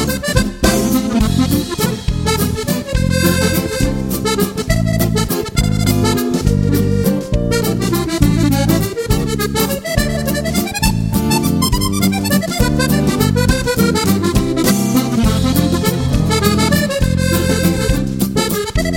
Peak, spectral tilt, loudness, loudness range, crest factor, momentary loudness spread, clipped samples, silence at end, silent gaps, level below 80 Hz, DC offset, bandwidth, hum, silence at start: 0 dBFS; -5 dB/octave; -15 LUFS; 2 LU; 14 dB; 4 LU; under 0.1%; 0 s; none; -24 dBFS; under 0.1%; 17 kHz; none; 0 s